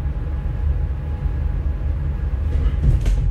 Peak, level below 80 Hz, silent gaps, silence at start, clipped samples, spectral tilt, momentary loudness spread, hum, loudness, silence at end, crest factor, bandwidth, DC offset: -6 dBFS; -20 dBFS; none; 0 s; under 0.1%; -8.5 dB/octave; 6 LU; none; -23 LUFS; 0 s; 14 dB; 7.2 kHz; under 0.1%